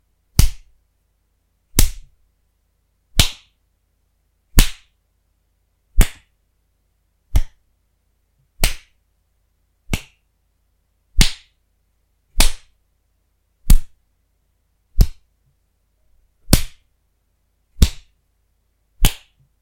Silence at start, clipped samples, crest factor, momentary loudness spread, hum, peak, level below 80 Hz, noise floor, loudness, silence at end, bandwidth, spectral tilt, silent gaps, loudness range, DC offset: 0.4 s; under 0.1%; 20 dB; 21 LU; none; 0 dBFS; -22 dBFS; -66 dBFS; -21 LUFS; 0.45 s; 16.5 kHz; -3.5 dB/octave; none; 6 LU; under 0.1%